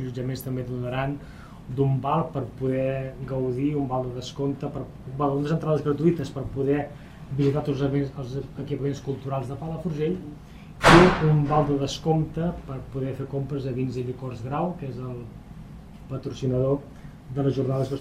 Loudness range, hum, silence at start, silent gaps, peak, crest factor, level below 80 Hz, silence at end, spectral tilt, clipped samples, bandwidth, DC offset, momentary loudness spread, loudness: 9 LU; none; 0 s; none; 0 dBFS; 26 dB; -44 dBFS; 0 s; -7 dB/octave; under 0.1%; 13.5 kHz; under 0.1%; 14 LU; -26 LUFS